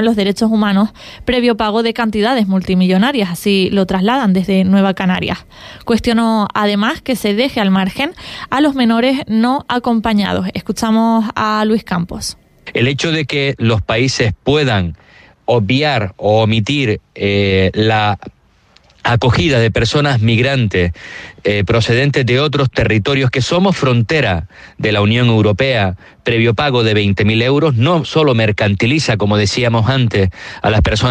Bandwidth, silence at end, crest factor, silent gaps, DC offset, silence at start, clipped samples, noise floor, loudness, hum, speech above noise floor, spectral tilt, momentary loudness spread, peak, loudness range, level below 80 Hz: 14.5 kHz; 0 s; 12 dB; none; under 0.1%; 0 s; under 0.1%; -50 dBFS; -14 LUFS; none; 37 dB; -6 dB/octave; 7 LU; -2 dBFS; 3 LU; -36 dBFS